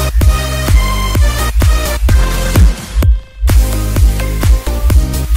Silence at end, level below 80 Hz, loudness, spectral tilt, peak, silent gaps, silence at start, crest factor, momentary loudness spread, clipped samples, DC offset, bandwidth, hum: 0 s; -12 dBFS; -13 LUFS; -5 dB/octave; 0 dBFS; none; 0 s; 10 dB; 3 LU; under 0.1%; under 0.1%; 16.5 kHz; none